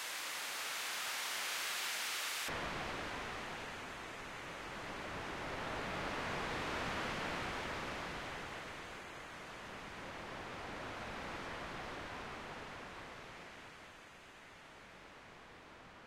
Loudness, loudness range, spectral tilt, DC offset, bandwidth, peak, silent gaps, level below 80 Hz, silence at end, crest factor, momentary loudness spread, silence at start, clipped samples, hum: -42 LUFS; 10 LU; -2.5 dB/octave; under 0.1%; 16 kHz; -28 dBFS; none; -60 dBFS; 0 s; 16 dB; 18 LU; 0 s; under 0.1%; none